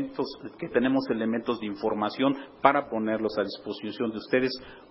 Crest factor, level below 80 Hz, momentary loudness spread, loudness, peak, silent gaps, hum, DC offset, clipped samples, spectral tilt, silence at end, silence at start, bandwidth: 24 dB; -64 dBFS; 11 LU; -28 LUFS; -4 dBFS; none; none; under 0.1%; under 0.1%; -9.5 dB/octave; 0.05 s; 0 s; 5.8 kHz